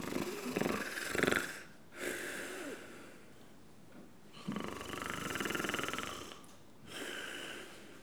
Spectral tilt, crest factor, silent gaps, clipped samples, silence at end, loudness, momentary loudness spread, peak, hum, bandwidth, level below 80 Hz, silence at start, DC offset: -3.5 dB/octave; 30 dB; none; under 0.1%; 0 s; -39 LUFS; 21 LU; -12 dBFS; none; over 20 kHz; -66 dBFS; 0 s; 0.1%